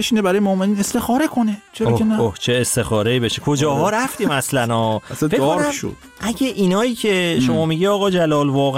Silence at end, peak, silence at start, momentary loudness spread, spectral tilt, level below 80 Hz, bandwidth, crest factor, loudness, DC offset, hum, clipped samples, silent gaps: 0 s; -8 dBFS; 0 s; 5 LU; -5 dB/octave; -48 dBFS; 16.5 kHz; 10 dB; -18 LUFS; under 0.1%; none; under 0.1%; none